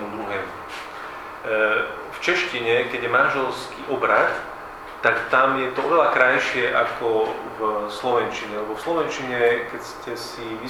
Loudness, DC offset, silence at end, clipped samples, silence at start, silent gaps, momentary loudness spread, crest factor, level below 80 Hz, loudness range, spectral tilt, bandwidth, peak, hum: -22 LUFS; under 0.1%; 0 s; under 0.1%; 0 s; none; 14 LU; 20 dB; -56 dBFS; 4 LU; -4 dB/octave; 16.5 kHz; -2 dBFS; none